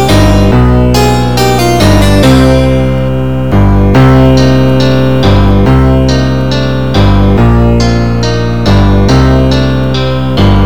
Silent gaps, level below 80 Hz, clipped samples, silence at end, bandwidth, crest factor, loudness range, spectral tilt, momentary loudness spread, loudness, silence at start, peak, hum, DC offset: none; -14 dBFS; 7%; 0 s; 18 kHz; 6 dB; 2 LU; -6.5 dB/octave; 6 LU; -7 LUFS; 0 s; 0 dBFS; none; 10%